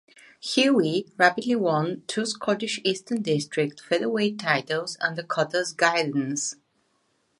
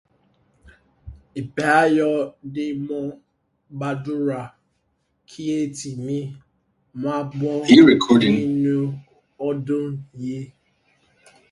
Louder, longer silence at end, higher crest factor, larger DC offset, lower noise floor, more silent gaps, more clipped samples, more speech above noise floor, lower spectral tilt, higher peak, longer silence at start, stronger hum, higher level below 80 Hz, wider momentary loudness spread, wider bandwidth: second, -25 LUFS vs -20 LUFS; second, 0.85 s vs 1.05 s; about the same, 22 dB vs 22 dB; neither; about the same, -70 dBFS vs -70 dBFS; neither; neither; second, 45 dB vs 50 dB; second, -4 dB/octave vs -6 dB/octave; second, -4 dBFS vs 0 dBFS; second, 0.45 s vs 1.05 s; neither; second, -74 dBFS vs -56 dBFS; second, 8 LU vs 20 LU; about the same, 11.5 kHz vs 11.5 kHz